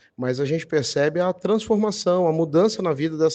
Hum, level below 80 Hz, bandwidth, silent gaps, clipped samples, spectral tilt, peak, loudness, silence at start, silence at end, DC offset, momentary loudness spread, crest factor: none; -62 dBFS; 8.8 kHz; none; under 0.1%; -5.5 dB/octave; -8 dBFS; -22 LUFS; 0.2 s; 0 s; under 0.1%; 4 LU; 14 dB